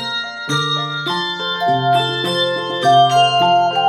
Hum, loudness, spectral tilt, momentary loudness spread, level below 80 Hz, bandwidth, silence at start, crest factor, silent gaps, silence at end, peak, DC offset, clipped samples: none; -16 LUFS; -4 dB/octave; 8 LU; -66 dBFS; 13.5 kHz; 0 s; 14 dB; none; 0 s; -2 dBFS; under 0.1%; under 0.1%